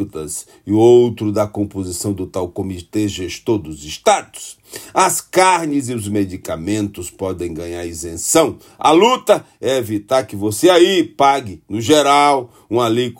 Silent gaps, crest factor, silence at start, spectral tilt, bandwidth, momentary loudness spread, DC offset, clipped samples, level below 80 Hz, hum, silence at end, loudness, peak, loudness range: none; 16 dB; 0 s; -4 dB/octave; 16.5 kHz; 14 LU; under 0.1%; under 0.1%; -52 dBFS; none; 0.05 s; -16 LUFS; 0 dBFS; 6 LU